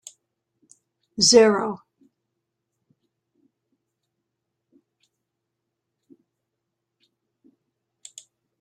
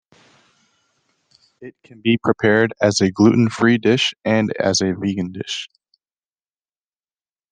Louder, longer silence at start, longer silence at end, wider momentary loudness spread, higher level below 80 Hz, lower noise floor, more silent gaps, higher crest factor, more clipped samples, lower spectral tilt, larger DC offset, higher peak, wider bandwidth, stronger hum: about the same, -17 LUFS vs -18 LUFS; second, 1.2 s vs 1.6 s; first, 6.85 s vs 1.85 s; first, 30 LU vs 11 LU; about the same, -66 dBFS vs -62 dBFS; second, -81 dBFS vs under -90 dBFS; neither; first, 26 dB vs 18 dB; neither; second, -2.5 dB/octave vs -5 dB/octave; neither; about the same, -2 dBFS vs -2 dBFS; first, 11.5 kHz vs 10 kHz; neither